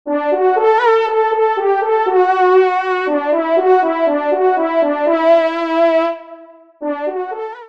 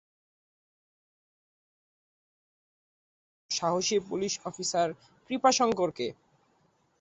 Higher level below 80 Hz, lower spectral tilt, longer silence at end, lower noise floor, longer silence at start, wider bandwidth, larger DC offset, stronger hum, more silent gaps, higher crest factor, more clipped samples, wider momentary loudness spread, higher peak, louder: about the same, -70 dBFS vs -72 dBFS; about the same, -4 dB/octave vs -3 dB/octave; second, 0 s vs 0.9 s; second, -39 dBFS vs -69 dBFS; second, 0.05 s vs 3.5 s; second, 7 kHz vs 8.4 kHz; first, 0.3% vs under 0.1%; neither; neither; second, 14 dB vs 22 dB; neither; second, 9 LU vs 12 LU; first, -2 dBFS vs -10 dBFS; first, -14 LUFS vs -29 LUFS